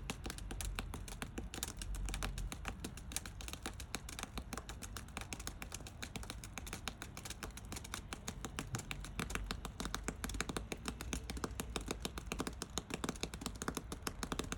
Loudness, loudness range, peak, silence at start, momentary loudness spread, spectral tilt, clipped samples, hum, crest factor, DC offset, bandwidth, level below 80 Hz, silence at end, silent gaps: -45 LUFS; 3 LU; -16 dBFS; 0 s; 5 LU; -3.5 dB/octave; under 0.1%; none; 28 dB; under 0.1%; 18 kHz; -50 dBFS; 0 s; none